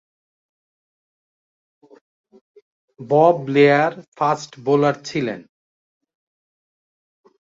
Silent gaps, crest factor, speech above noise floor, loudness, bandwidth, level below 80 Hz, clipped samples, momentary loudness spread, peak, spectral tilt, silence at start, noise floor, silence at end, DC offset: 4.08-4.12 s; 20 dB; over 72 dB; -18 LUFS; 7.6 kHz; -68 dBFS; under 0.1%; 10 LU; -2 dBFS; -6.5 dB/octave; 3 s; under -90 dBFS; 2.15 s; under 0.1%